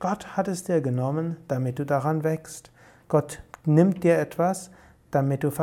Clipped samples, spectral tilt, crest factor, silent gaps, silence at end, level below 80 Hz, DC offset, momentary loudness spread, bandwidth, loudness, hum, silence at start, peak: under 0.1%; -7.5 dB/octave; 18 dB; none; 0 s; -60 dBFS; under 0.1%; 12 LU; 17 kHz; -25 LUFS; none; 0 s; -6 dBFS